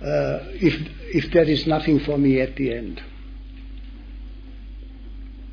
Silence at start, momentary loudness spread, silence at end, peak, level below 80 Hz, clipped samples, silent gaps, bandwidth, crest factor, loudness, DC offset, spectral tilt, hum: 0 s; 22 LU; 0 s; -6 dBFS; -36 dBFS; under 0.1%; none; 5.4 kHz; 18 dB; -21 LUFS; under 0.1%; -8 dB/octave; none